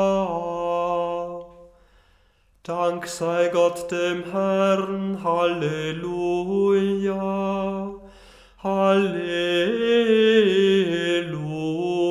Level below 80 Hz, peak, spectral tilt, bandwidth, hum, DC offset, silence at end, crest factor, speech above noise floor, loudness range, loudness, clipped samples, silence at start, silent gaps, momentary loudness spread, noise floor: -56 dBFS; -6 dBFS; -5.5 dB/octave; 14.5 kHz; none; under 0.1%; 0 s; 16 dB; 38 dB; 6 LU; -22 LUFS; under 0.1%; 0 s; none; 10 LU; -60 dBFS